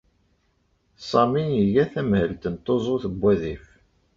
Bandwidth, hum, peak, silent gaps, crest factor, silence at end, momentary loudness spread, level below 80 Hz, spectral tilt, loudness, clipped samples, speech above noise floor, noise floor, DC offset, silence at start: 7.4 kHz; none; -6 dBFS; none; 18 dB; 0.6 s; 10 LU; -48 dBFS; -8 dB/octave; -23 LUFS; under 0.1%; 45 dB; -67 dBFS; under 0.1%; 1 s